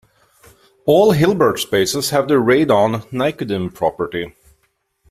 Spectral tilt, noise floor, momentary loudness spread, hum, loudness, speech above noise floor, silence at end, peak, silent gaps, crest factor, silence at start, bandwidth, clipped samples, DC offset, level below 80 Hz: -5 dB/octave; -65 dBFS; 11 LU; none; -16 LUFS; 50 dB; 0.8 s; -2 dBFS; none; 14 dB; 0.85 s; 16 kHz; under 0.1%; under 0.1%; -50 dBFS